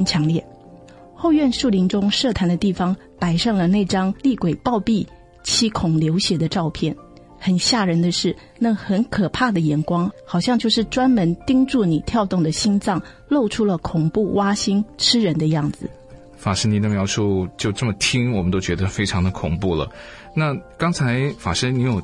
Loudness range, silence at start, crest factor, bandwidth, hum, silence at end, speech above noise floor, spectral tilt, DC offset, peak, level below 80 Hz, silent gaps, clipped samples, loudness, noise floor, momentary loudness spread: 2 LU; 0 s; 16 dB; 11.5 kHz; none; 0 s; 24 dB; -5 dB/octave; under 0.1%; -4 dBFS; -44 dBFS; none; under 0.1%; -20 LUFS; -43 dBFS; 6 LU